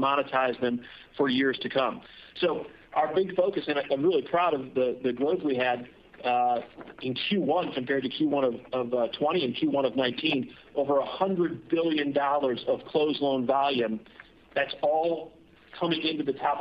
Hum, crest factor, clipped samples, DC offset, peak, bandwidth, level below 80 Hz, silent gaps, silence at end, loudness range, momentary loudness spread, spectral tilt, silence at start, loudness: none; 16 dB; under 0.1%; under 0.1%; -10 dBFS; 5.6 kHz; -66 dBFS; none; 0 s; 1 LU; 8 LU; -8 dB/octave; 0 s; -28 LUFS